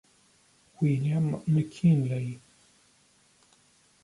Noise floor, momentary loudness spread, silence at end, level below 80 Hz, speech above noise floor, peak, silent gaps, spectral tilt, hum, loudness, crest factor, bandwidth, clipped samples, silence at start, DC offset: -64 dBFS; 11 LU; 1.65 s; -66 dBFS; 38 dB; -12 dBFS; none; -8.5 dB/octave; none; -27 LUFS; 16 dB; 11.5 kHz; under 0.1%; 0.8 s; under 0.1%